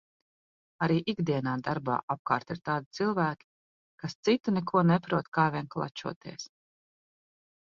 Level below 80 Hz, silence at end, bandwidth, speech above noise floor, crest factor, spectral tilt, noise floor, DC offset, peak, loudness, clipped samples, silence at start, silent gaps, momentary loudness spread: -68 dBFS; 1.2 s; 7.2 kHz; over 61 dB; 22 dB; -6.5 dB/octave; under -90 dBFS; under 0.1%; -10 dBFS; -30 LUFS; under 0.1%; 0.8 s; 2.03-2.08 s, 2.19-2.25 s, 2.86-2.91 s, 3.44-3.98 s, 4.15-4.23 s, 5.28-5.32 s, 6.16-6.21 s; 15 LU